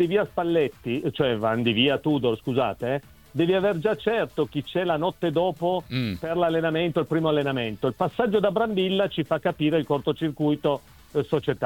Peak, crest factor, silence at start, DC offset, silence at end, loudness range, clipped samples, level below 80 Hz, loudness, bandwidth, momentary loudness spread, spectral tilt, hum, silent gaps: -8 dBFS; 16 dB; 0 s; 0.1%; 0 s; 1 LU; under 0.1%; -56 dBFS; -25 LUFS; 18 kHz; 6 LU; -7.5 dB/octave; none; none